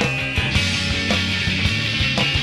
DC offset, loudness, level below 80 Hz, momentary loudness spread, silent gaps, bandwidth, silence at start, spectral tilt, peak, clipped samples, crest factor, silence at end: under 0.1%; -19 LUFS; -32 dBFS; 2 LU; none; 13.5 kHz; 0 s; -4 dB/octave; -4 dBFS; under 0.1%; 16 dB; 0 s